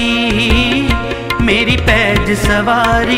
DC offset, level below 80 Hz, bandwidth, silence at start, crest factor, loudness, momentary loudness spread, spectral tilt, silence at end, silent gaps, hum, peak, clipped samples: under 0.1%; -22 dBFS; 16 kHz; 0 s; 12 dB; -12 LUFS; 5 LU; -5 dB/octave; 0 s; none; none; 0 dBFS; under 0.1%